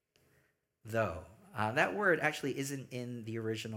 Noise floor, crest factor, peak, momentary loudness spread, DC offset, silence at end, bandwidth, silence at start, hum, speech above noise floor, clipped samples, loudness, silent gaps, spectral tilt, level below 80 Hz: -74 dBFS; 22 dB; -14 dBFS; 12 LU; under 0.1%; 0 s; 17 kHz; 0.85 s; none; 40 dB; under 0.1%; -35 LUFS; none; -5 dB/octave; -68 dBFS